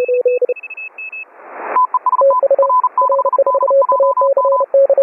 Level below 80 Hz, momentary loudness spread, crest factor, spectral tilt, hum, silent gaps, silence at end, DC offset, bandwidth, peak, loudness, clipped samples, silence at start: -80 dBFS; 14 LU; 10 dB; -7 dB/octave; none; none; 0 s; under 0.1%; 2.8 kHz; -4 dBFS; -13 LUFS; under 0.1%; 0 s